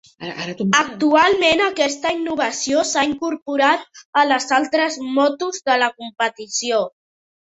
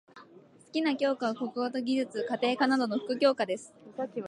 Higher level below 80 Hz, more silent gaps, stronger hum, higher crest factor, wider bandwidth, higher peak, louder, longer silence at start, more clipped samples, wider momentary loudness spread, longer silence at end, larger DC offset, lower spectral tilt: first, -60 dBFS vs -84 dBFS; first, 3.42-3.46 s, 4.05-4.13 s vs none; neither; about the same, 18 dB vs 18 dB; second, 8.2 kHz vs 11.5 kHz; first, -2 dBFS vs -12 dBFS; first, -18 LUFS vs -30 LUFS; about the same, 0.2 s vs 0.15 s; neither; about the same, 9 LU vs 10 LU; first, 0.5 s vs 0 s; neither; second, -2.5 dB/octave vs -4.5 dB/octave